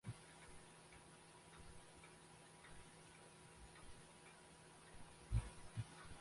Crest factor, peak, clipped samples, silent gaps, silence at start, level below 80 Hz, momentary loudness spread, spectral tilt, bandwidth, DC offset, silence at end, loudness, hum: 26 dB; -30 dBFS; under 0.1%; none; 0.05 s; -58 dBFS; 16 LU; -5 dB/octave; 11.5 kHz; under 0.1%; 0 s; -56 LUFS; none